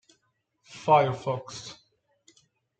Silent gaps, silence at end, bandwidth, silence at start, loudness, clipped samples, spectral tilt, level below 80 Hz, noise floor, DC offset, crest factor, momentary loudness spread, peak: none; 1.05 s; 9 kHz; 0.7 s; -25 LUFS; under 0.1%; -5.5 dB/octave; -70 dBFS; -74 dBFS; under 0.1%; 22 dB; 22 LU; -8 dBFS